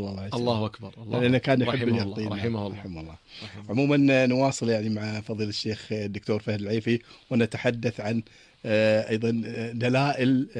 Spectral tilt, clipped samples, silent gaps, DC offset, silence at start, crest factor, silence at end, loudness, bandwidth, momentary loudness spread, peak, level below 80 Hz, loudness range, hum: -6.5 dB/octave; under 0.1%; none; under 0.1%; 0 s; 14 dB; 0 s; -26 LUFS; 10.5 kHz; 12 LU; -12 dBFS; -60 dBFS; 3 LU; none